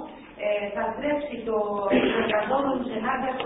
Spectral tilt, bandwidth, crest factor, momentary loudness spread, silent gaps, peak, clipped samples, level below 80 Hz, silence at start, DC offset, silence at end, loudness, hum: -9.5 dB/octave; 4 kHz; 16 dB; 6 LU; none; -10 dBFS; under 0.1%; -56 dBFS; 0 s; under 0.1%; 0 s; -26 LUFS; none